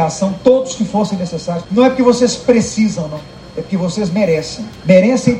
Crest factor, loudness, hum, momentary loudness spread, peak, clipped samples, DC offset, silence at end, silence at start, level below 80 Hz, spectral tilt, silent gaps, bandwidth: 14 dB; -14 LUFS; none; 13 LU; 0 dBFS; 0.2%; under 0.1%; 0 s; 0 s; -44 dBFS; -5.5 dB/octave; none; 11 kHz